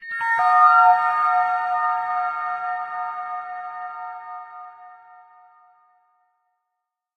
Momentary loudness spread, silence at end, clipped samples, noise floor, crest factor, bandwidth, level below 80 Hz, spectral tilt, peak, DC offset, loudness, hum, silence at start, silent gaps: 22 LU; 2.2 s; under 0.1%; -81 dBFS; 18 dB; 9.8 kHz; -74 dBFS; -2 dB/octave; -4 dBFS; under 0.1%; -19 LUFS; none; 0 s; none